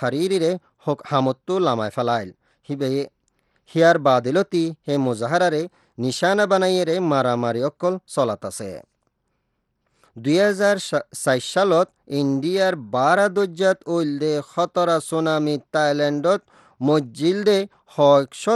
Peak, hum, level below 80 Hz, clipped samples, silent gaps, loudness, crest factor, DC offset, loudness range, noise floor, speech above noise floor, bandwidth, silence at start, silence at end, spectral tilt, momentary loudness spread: -4 dBFS; none; -70 dBFS; under 0.1%; none; -21 LUFS; 18 dB; under 0.1%; 4 LU; -73 dBFS; 53 dB; 12.5 kHz; 0 s; 0 s; -5.5 dB/octave; 10 LU